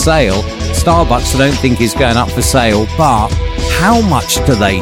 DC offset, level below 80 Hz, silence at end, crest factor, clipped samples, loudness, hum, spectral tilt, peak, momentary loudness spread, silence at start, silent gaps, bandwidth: under 0.1%; -20 dBFS; 0 s; 10 dB; under 0.1%; -11 LUFS; none; -4.5 dB/octave; 0 dBFS; 5 LU; 0 s; none; 17 kHz